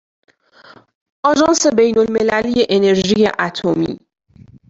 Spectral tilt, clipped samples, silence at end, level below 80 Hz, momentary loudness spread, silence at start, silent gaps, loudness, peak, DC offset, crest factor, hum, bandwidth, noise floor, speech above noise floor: -4 dB/octave; under 0.1%; 0.75 s; -50 dBFS; 7 LU; 1.25 s; none; -15 LUFS; -2 dBFS; under 0.1%; 16 dB; none; 8 kHz; -45 dBFS; 31 dB